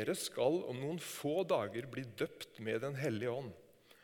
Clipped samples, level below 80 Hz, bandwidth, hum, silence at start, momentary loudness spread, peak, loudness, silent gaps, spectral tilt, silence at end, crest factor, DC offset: under 0.1%; -80 dBFS; 19 kHz; none; 0 s; 9 LU; -20 dBFS; -39 LUFS; none; -5 dB/octave; 0.4 s; 18 dB; under 0.1%